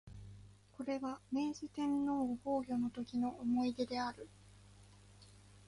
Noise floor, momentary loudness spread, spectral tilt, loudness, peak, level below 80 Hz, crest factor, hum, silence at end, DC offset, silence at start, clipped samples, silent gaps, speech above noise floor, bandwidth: -61 dBFS; 19 LU; -6 dB/octave; -39 LUFS; -24 dBFS; -66 dBFS; 16 dB; 50 Hz at -65 dBFS; 0 s; under 0.1%; 0.05 s; under 0.1%; none; 23 dB; 11.5 kHz